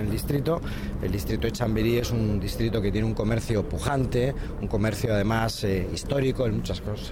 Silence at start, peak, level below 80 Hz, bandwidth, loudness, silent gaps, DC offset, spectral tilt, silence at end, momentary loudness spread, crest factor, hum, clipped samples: 0 s; -12 dBFS; -34 dBFS; 17.5 kHz; -27 LUFS; none; under 0.1%; -6.5 dB/octave; 0 s; 5 LU; 14 dB; none; under 0.1%